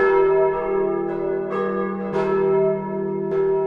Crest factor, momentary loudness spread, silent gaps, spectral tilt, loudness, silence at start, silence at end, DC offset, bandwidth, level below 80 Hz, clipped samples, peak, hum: 14 dB; 7 LU; none; -9 dB/octave; -21 LUFS; 0 s; 0 s; under 0.1%; 4.7 kHz; -50 dBFS; under 0.1%; -6 dBFS; none